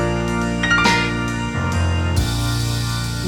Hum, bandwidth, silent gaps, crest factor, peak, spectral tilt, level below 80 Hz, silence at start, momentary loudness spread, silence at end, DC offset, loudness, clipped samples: none; 18 kHz; none; 16 dB; -4 dBFS; -4.5 dB/octave; -30 dBFS; 0 s; 7 LU; 0 s; under 0.1%; -19 LUFS; under 0.1%